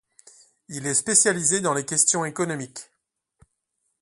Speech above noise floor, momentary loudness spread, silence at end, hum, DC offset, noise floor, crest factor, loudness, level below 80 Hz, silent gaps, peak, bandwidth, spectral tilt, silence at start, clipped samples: 53 dB; 19 LU; 1.2 s; none; under 0.1%; -76 dBFS; 24 dB; -21 LUFS; -68 dBFS; none; -2 dBFS; 12 kHz; -2.5 dB/octave; 0.7 s; under 0.1%